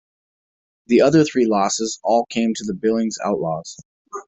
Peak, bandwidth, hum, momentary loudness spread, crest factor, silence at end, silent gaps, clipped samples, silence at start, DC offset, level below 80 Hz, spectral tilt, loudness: -2 dBFS; 8.4 kHz; none; 11 LU; 18 dB; 0.05 s; 3.85-4.05 s; under 0.1%; 0.9 s; under 0.1%; -58 dBFS; -5 dB/octave; -19 LUFS